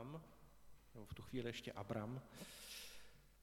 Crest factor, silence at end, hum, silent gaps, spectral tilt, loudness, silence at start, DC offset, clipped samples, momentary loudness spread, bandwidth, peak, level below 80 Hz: 22 dB; 0 s; none; none; -5 dB/octave; -51 LUFS; 0 s; under 0.1%; under 0.1%; 17 LU; 18 kHz; -30 dBFS; -70 dBFS